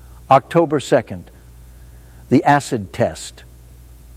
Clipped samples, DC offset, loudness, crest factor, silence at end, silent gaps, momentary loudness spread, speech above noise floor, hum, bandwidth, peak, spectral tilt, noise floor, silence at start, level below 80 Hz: under 0.1%; under 0.1%; -17 LUFS; 18 dB; 0.85 s; none; 18 LU; 25 dB; none; 16 kHz; 0 dBFS; -6 dB/octave; -42 dBFS; 0.3 s; -44 dBFS